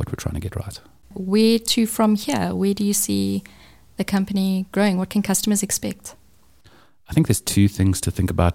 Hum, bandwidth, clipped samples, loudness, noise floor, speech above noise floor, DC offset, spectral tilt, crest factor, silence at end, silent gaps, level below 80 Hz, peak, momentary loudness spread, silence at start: none; 17 kHz; under 0.1%; -21 LUFS; -55 dBFS; 35 dB; under 0.1%; -5 dB/octave; 18 dB; 0 s; none; -40 dBFS; -4 dBFS; 14 LU; 0 s